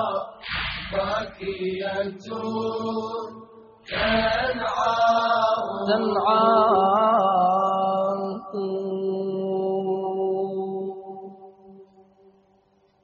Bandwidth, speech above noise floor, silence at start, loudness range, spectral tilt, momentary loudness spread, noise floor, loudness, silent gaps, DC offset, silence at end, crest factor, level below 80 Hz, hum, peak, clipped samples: 7 kHz; 40 dB; 0 s; 9 LU; -3 dB/octave; 13 LU; -62 dBFS; -24 LUFS; none; under 0.1%; 1.2 s; 18 dB; -52 dBFS; none; -6 dBFS; under 0.1%